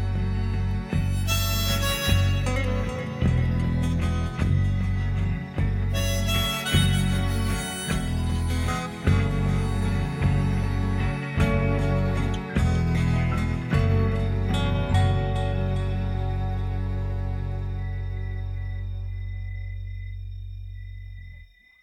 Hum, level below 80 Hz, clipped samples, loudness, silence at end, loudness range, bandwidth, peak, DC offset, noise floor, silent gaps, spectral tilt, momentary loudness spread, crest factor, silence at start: none; -30 dBFS; under 0.1%; -26 LUFS; 0.4 s; 8 LU; 17.5 kHz; -8 dBFS; under 0.1%; -48 dBFS; none; -5.5 dB/octave; 11 LU; 16 dB; 0 s